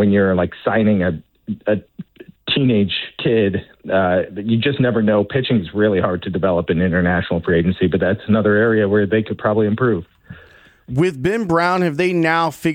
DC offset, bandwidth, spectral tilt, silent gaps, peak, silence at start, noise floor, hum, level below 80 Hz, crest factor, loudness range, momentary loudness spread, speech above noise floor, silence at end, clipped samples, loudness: under 0.1%; 16 kHz; -7.5 dB/octave; none; -4 dBFS; 0 s; -47 dBFS; none; -46 dBFS; 12 dB; 2 LU; 6 LU; 30 dB; 0 s; under 0.1%; -17 LUFS